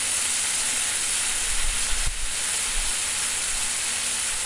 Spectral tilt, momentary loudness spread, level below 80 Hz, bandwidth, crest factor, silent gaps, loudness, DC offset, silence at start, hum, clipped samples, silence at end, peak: 1 dB/octave; 2 LU; -36 dBFS; 11.5 kHz; 14 dB; none; -23 LUFS; under 0.1%; 0 s; none; under 0.1%; 0 s; -10 dBFS